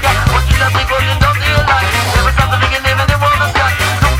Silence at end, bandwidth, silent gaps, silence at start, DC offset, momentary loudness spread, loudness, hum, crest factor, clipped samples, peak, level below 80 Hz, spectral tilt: 0 s; 19 kHz; none; 0 s; under 0.1%; 1 LU; -11 LUFS; none; 12 dB; under 0.1%; 0 dBFS; -20 dBFS; -4 dB/octave